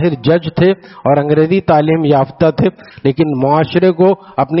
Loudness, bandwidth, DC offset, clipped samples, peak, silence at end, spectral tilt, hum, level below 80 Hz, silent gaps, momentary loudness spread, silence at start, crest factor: -13 LUFS; 5.8 kHz; under 0.1%; under 0.1%; 0 dBFS; 0 s; -6.5 dB/octave; none; -46 dBFS; none; 6 LU; 0 s; 12 dB